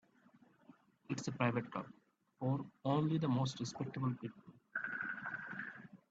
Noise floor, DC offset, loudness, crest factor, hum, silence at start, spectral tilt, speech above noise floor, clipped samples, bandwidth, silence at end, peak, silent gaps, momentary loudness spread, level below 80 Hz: -68 dBFS; under 0.1%; -40 LUFS; 22 dB; none; 0.7 s; -6.5 dB/octave; 30 dB; under 0.1%; 8 kHz; 0.15 s; -18 dBFS; none; 12 LU; -78 dBFS